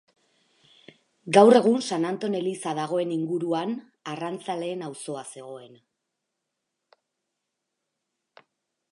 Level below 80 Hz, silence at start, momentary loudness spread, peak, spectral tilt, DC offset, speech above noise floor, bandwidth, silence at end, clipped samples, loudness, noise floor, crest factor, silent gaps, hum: -82 dBFS; 1.25 s; 21 LU; -2 dBFS; -5.5 dB/octave; under 0.1%; 58 dB; 11.5 kHz; 3.25 s; under 0.1%; -24 LUFS; -82 dBFS; 24 dB; none; none